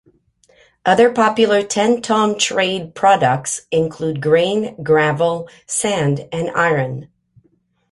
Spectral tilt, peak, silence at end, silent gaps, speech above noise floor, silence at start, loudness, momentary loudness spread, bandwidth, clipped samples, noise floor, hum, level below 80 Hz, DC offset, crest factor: -4 dB/octave; -2 dBFS; 0.85 s; none; 45 dB; 0.85 s; -17 LUFS; 8 LU; 11.5 kHz; under 0.1%; -61 dBFS; none; -56 dBFS; under 0.1%; 16 dB